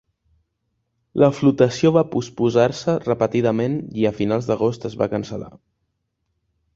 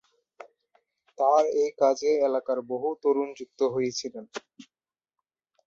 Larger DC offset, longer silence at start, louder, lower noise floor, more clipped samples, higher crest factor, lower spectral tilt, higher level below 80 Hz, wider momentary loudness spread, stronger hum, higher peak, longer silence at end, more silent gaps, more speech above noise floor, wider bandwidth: neither; about the same, 1.15 s vs 1.2 s; first, -20 LUFS vs -26 LUFS; second, -74 dBFS vs under -90 dBFS; neither; about the same, 18 dB vs 18 dB; first, -7 dB/octave vs -4 dB/octave; first, -54 dBFS vs -74 dBFS; second, 9 LU vs 14 LU; neither; first, -2 dBFS vs -10 dBFS; first, 1.25 s vs 1.05 s; neither; second, 55 dB vs over 64 dB; about the same, 7.8 kHz vs 7.6 kHz